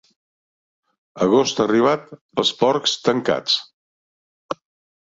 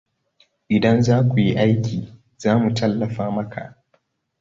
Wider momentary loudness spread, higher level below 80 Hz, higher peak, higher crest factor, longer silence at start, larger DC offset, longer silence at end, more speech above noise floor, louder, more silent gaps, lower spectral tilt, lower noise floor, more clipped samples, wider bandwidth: about the same, 15 LU vs 15 LU; second, -62 dBFS vs -52 dBFS; about the same, -4 dBFS vs -4 dBFS; about the same, 18 dB vs 16 dB; first, 1.15 s vs 0.7 s; neither; second, 0.5 s vs 0.7 s; first, over 71 dB vs 47 dB; about the same, -19 LUFS vs -20 LUFS; first, 2.21-2.29 s, 3.73-4.49 s vs none; second, -4 dB/octave vs -7.5 dB/octave; first, under -90 dBFS vs -66 dBFS; neither; about the same, 8 kHz vs 7.6 kHz